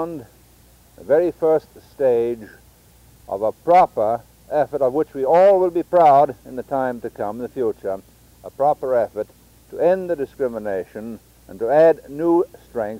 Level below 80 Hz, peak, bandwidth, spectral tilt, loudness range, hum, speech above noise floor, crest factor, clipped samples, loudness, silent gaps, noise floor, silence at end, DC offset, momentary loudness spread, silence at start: -54 dBFS; -6 dBFS; 16 kHz; -7.5 dB/octave; 6 LU; none; 32 dB; 14 dB; under 0.1%; -19 LUFS; none; -51 dBFS; 0 s; under 0.1%; 17 LU; 0 s